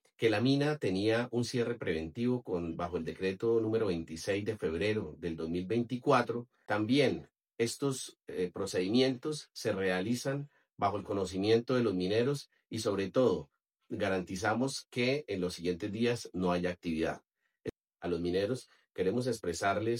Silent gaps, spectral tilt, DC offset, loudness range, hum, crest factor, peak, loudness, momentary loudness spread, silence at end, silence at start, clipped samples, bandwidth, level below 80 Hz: none; -5.5 dB/octave; under 0.1%; 3 LU; none; 20 dB; -12 dBFS; -33 LUFS; 10 LU; 0 s; 0.2 s; under 0.1%; 16 kHz; -66 dBFS